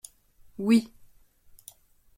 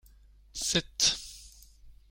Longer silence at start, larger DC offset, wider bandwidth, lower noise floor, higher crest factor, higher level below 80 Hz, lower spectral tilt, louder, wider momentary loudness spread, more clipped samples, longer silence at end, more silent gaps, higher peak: about the same, 0.6 s vs 0.55 s; neither; about the same, 16.5 kHz vs 16.5 kHz; about the same, -56 dBFS vs -57 dBFS; about the same, 20 dB vs 22 dB; second, -64 dBFS vs -54 dBFS; first, -5.5 dB/octave vs -1 dB/octave; first, -25 LUFS vs -28 LUFS; first, 26 LU vs 20 LU; neither; first, 1.3 s vs 0.2 s; neither; about the same, -12 dBFS vs -12 dBFS